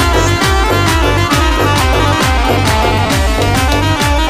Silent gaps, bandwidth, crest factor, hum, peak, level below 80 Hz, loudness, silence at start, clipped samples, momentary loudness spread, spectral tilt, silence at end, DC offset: none; 16 kHz; 10 dB; none; 0 dBFS; -18 dBFS; -11 LUFS; 0 s; under 0.1%; 1 LU; -4.5 dB/octave; 0 s; 0.5%